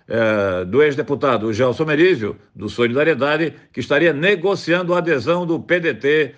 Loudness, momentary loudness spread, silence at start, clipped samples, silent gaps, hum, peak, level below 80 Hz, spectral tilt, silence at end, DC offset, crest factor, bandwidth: -18 LUFS; 6 LU; 0.1 s; under 0.1%; none; none; -4 dBFS; -60 dBFS; -6.5 dB/octave; 0.05 s; under 0.1%; 14 dB; 8.8 kHz